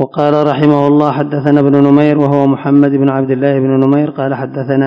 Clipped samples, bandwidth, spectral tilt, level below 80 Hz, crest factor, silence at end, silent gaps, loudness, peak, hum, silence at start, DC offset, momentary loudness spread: 1%; 5.4 kHz; -10 dB/octave; -58 dBFS; 10 dB; 0 s; none; -11 LUFS; 0 dBFS; none; 0 s; under 0.1%; 7 LU